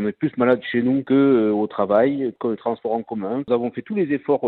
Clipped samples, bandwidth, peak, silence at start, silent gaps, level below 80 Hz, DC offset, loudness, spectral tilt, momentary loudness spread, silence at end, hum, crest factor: under 0.1%; 4.3 kHz; -6 dBFS; 0 s; none; -62 dBFS; under 0.1%; -21 LUFS; -10.5 dB/octave; 8 LU; 0 s; none; 14 dB